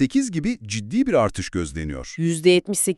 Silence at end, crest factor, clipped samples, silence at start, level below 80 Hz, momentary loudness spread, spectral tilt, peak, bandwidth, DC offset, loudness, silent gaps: 0.05 s; 18 dB; under 0.1%; 0 s; -42 dBFS; 11 LU; -4.5 dB/octave; -4 dBFS; 13.5 kHz; under 0.1%; -22 LUFS; none